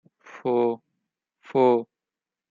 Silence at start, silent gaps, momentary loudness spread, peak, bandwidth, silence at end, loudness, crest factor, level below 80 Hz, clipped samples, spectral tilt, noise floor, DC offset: 0.35 s; none; 15 LU; -8 dBFS; 7 kHz; 0.65 s; -24 LUFS; 18 dB; -80 dBFS; under 0.1%; -8.5 dB/octave; -90 dBFS; under 0.1%